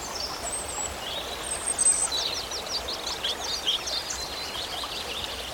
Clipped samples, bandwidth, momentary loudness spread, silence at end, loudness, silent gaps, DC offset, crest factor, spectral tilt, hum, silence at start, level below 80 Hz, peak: under 0.1%; 19 kHz; 10 LU; 0 s; -27 LUFS; none; under 0.1%; 18 dB; 0 dB/octave; none; 0 s; -50 dBFS; -12 dBFS